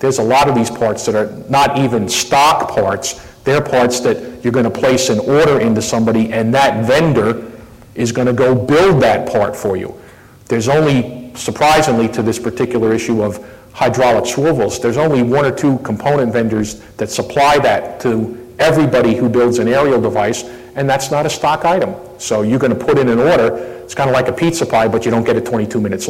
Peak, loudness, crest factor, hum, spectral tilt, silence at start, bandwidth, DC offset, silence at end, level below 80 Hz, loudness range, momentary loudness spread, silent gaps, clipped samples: -4 dBFS; -14 LUFS; 10 dB; none; -5 dB/octave; 0 s; 16.5 kHz; under 0.1%; 0 s; -42 dBFS; 2 LU; 9 LU; none; under 0.1%